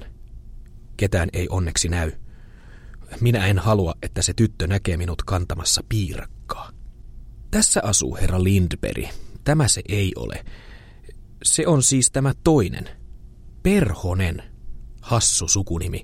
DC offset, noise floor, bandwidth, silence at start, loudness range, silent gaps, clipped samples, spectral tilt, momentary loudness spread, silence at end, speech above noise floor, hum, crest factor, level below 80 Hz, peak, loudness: under 0.1%; -42 dBFS; 16 kHz; 0 s; 4 LU; none; under 0.1%; -4 dB/octave; 17 LU; 0 s; 21 dB; none; 18 dB; -34 dBFS; -4 dBFS; -21 LUFS